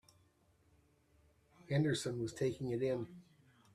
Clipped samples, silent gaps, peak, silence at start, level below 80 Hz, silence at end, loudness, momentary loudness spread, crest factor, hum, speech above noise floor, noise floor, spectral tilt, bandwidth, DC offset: under 0.1%; none; -22 dBFS; 1.7 s; -70 dBFS; 0.55 s; -38 LUFS; 7 LU; 18 dB; none; 35 dB; -72 dBFS; -6 dB/octave; 13.5 kHz; under 0.1%